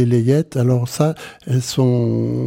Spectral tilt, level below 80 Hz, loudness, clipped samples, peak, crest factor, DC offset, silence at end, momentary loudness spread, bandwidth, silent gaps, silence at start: -7 dB/octave; -52 dBFS; -18 LUFS; under 0.1%; -4 dBFS; 14 dB; under 0.1%; 0 s; 5 LU; 16 kHz; none; 0 s